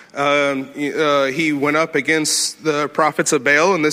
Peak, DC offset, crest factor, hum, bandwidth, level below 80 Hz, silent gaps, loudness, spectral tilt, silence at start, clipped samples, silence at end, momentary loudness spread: -2 dBFS; under 0.1%; 16 dB; none; 16 kHz; -66 dBFS; none; -17 LUFS; -3 dB/octave; 0.15 s; under 0.1%; 0 s; 6 LU